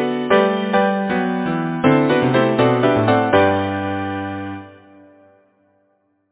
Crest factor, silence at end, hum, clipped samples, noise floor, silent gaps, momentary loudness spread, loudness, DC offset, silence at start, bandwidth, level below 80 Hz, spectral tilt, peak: 18 dB; 1.6 s; none; under 0.1%; -64 dBFS; none; 10 LU; -17 LUFS; under 0.1%; 0 s; 4 kHz; -48 dBFS; -10.5 dB/octave; 0 dBFS